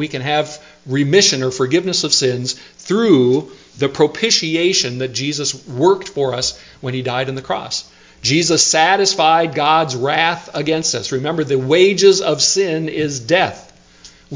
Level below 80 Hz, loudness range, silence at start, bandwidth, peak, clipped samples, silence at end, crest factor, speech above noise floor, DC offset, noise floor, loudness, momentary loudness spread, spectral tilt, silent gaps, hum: -54 dBFS; 4 LU; 0 s; 7.8 kHz; 0 dBFS; under 0.1%; 0 s; 16 dB; 28 dB; under 0.1%; -44 dBFS; -15 LUFS; 10 LU; -3.5 dB/octave; none; none